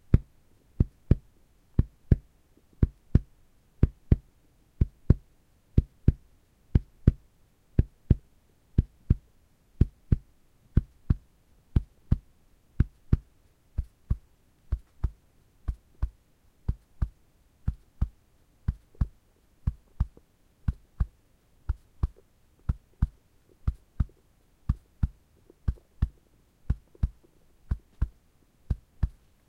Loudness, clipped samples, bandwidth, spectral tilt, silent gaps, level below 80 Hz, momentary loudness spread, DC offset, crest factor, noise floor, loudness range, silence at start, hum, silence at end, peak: -32 LUFS; under 0.1%; 4.7 kHz; -10.5 dB/octave; none; -34 dBFS; 11 LU; under 0.1%; 26 dB; -63 dBFS; 8 LU; 0.1 s; none; 0.4 s; -4 dBFS